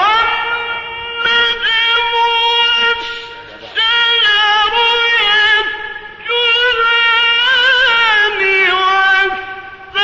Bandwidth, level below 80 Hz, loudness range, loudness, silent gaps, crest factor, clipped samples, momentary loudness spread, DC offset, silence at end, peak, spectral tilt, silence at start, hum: 8 kHz; -46 dBFS; 2 LU; -11 LUFS; none; 12 dB; under 0.1%; 13 LU; under 0.1%; 0 s; -2 dBFS; -1 dB/octave; 0 s; none